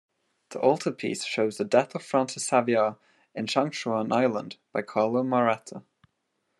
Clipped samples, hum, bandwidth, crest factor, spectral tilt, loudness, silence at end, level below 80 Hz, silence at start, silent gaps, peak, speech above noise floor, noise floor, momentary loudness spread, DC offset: under 0.1%; none; 12 kHz; 20 dB; -4.5 dB/octave; -26 LUFS; 0.8 s; -78 dBFS; 0.5 s; none; -8 dBFS; 51 dB; -77 dBFS; 10 LU; under 0.1%